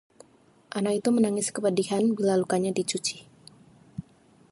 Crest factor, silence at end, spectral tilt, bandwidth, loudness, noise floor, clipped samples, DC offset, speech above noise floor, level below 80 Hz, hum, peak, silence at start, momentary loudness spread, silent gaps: 16 dB; 0.5 s; -4.5 dB/octave; 11.5 kHz; -26 LUFS; -59 dBFS; under 0.1%; under 0.1%; 34 dB; -68 dBFS; none; -12 dBFS; 0.75 s; 19 LU; none